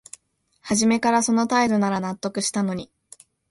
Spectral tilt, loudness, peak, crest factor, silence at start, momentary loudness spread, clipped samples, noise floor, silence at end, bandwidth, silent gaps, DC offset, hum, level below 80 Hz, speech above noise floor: -4 dB/octave; -22 LUFS; -6 dBFS; 18 dB; 0.65 s; 11 LU; under 0.1%; -64 dBFS; 0.65 s; 11.5 kHz; none; under 0.1%; none; -60 dBFS; 43 dB